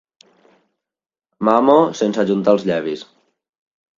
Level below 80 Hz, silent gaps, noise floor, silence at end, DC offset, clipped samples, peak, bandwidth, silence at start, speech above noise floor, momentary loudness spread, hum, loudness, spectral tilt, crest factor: -64 dBFS; none; -90 dBFS; 0.95 s; under 0.1%; under 0.1%; 0 dBFS; 7.6 kHz; 1.4 s; 74 dB; 11 LU; none; -16 LUFS; -6.5 dB/octave; 18 dB